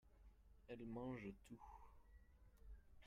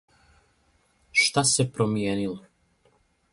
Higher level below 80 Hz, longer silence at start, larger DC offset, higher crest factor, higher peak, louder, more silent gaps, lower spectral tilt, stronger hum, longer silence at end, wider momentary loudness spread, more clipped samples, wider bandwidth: second, -68 dBFS vs -60 dBFS; second, 0.05 s vs 1.15 s; neither; about the same, 18 dB vs 20 dB; second, -40 dBFS vs -8 dBFS; second, -55 LUFS vs -23 LUFS; neither; first, -7.5 dB/octave vs -3 dB/octave; neither; second, 0 s vs 0.95 s; first, 16 LU vs 12 LU; neither; first, 13 kHz vs 11.5 kHz